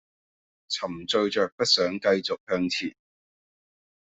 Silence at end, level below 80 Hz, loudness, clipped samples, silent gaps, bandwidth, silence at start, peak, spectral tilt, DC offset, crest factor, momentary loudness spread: 1.2 s; -66 dBFS; -25 LUFS; under 0.1%; 1.52-1.58 s, 2.40-2.47 s; 8.2 kHz; 0.7 s; -8 dBFS; -3.5 dB/octave; under 0.1%; 20 dB; 9 LU